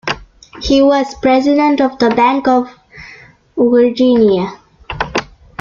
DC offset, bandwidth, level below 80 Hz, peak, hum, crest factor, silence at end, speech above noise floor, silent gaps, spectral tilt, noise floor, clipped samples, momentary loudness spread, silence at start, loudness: under 0.1%; 7.4 kHz; -38 dBFS; 0 dBFS; none; 14 dB; 0.35 s; 29 dB; none; -5.5 dB/octave; -40 dBFS; under 0.1%; 15 LU; 0.05 s; -13 LUFS